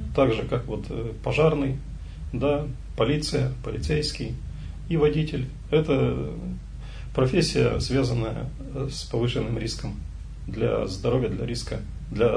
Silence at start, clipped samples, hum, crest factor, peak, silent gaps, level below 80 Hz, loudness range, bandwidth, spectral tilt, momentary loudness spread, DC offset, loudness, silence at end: 0 s; under 0.1%; none; 18 dB; -6 dBFS; none; -36 dBFS; 3 LU; 10.5 kHz; -6.5 dB/octave; 14 LU; under 0.1%; -26 LUFS; 0 s